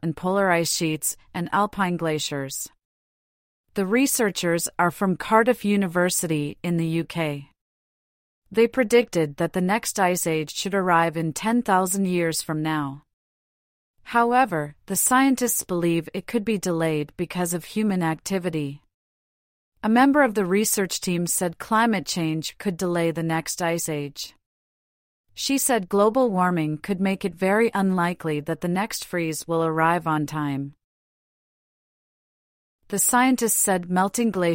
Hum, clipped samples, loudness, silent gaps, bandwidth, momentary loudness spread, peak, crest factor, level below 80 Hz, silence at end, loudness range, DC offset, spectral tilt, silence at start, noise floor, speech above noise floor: none; under 0.1%; -23 LUFS; 2.85-3.64 s, 7.61-8.42 s, 13.13-13.94 s, 18.94-19.72 s, 24.46-25.24 s, 30.84-32.79 s; 16.5 kHz; 9 LU; -4 dBFS; 20 dB; -60 dBFS; 0 s; 4 LU; under 0.1%; -4.5 dB/octave; 0.05 s; under -90 dBFS; over 67 dB